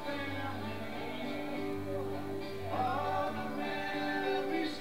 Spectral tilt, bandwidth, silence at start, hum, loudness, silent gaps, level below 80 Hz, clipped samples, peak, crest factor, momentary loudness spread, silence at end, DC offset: -6 dB/octave; 16 kHz; 0 s; none; -37 LUFS; none; -62 dBFS; under 0.1%; -22 dBFS; 14 dB; 7 LU; 0 s; 0.6%